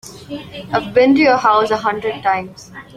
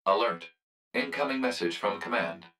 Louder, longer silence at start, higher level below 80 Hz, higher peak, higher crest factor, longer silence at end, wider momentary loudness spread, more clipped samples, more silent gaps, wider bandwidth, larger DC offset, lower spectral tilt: first, -15 LUFS vs -30 LUFS; about the same, 0.05 s vs 0.05 s; first, -52 dBFS vs -78 dBFS; first, 0 dBFS vs -12 dBFS; about the same, 16 dB vs 20 dB; about the same, 0.15 s vs 0.1 s; first, 19 LU vs 7 LU; neither; second, none vs 0.62-0.91 s; about the same, 14 kHz vs 15 kHz; neither; about the same, -5 dB/octave vs -4 dB/octave